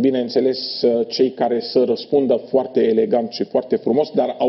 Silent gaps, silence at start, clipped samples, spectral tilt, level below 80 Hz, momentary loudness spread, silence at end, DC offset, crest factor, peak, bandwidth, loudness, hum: none; 0 s; under 0.1%; -6.5 dB/octave; -64 dBFS; 3 LU; 0 s; under 0.1%; 12 dB; -6 dBFS; 6 kHz; -19 LUFS; none